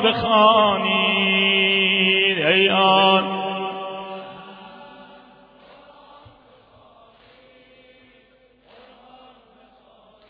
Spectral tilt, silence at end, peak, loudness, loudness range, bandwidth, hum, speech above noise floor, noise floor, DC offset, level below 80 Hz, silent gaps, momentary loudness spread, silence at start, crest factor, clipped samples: -7 dB/octave; 5.25 s; -2 dBFS; -16 LUFS; 20 LU; 5.2 kHz; none; 39 dB; -56 dBFS; under 0.1%; -60 dBFS; none; 19 LU; 0 s; 20 dB; under 0.1%